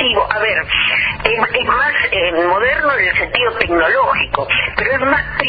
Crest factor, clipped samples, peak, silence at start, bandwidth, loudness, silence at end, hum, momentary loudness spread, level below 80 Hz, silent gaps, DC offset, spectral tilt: 16 dB; under 0.1%; 0 dBFS; 0 s; 6 kHz; -14 LUFS; 0 s; none; 2 LU; -36 dBFS; none; under 0.1%; -6.5 dB/octave